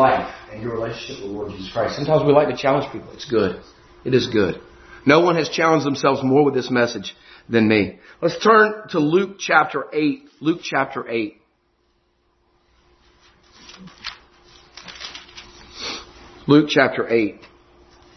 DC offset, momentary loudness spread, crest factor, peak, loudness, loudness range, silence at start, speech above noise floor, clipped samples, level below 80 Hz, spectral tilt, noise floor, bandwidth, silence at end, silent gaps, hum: under 0.1%; 19 LU; 20 dB; 0 dBFS; -19 LUFS; 17 LU; 0 s; 46 dB; under 0.1%; -54 dBFS; -5.5 dB/octave; -65 dBFS; 6.4 kHz; 0.8 s; none; none